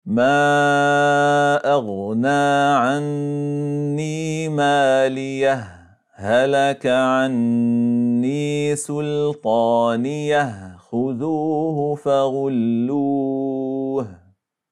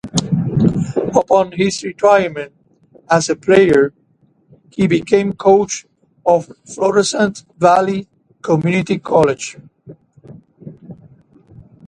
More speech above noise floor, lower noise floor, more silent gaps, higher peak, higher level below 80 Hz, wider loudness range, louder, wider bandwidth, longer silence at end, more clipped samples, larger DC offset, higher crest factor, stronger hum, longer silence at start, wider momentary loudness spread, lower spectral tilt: about the same, 40 dB vs 42 dB; about the same, -58 dBFS vs -56 dBFS; neither; second, -6 dBFS vs 0 dBFS; second, -68 dBFS vs -50 dBFS; about the same, 3 LU vs 5 LU; second, -19 LUFS vs -15 LUFS; about the same, 12 kHz vs 11 kHz; first, 0.55 s vs 0.25 s; neither; neither; about the same, 14 dB vs 16 dB; neither; about the same, 0.05 s vs 0.05 s; second, 8 LU vs 12 LU; about the same, -6 dB/octave vs -5.5 dB/octave